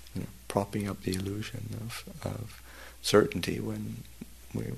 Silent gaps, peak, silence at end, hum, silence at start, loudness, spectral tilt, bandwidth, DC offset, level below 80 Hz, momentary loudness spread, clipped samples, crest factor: none; -8 dBFS; 0 s; none; 0 s; -32 LUFS; -5 dB/octave; 13.5 kHz; 0.2%; -54 dBFS; 20 LU; under 0.1%; 24 dB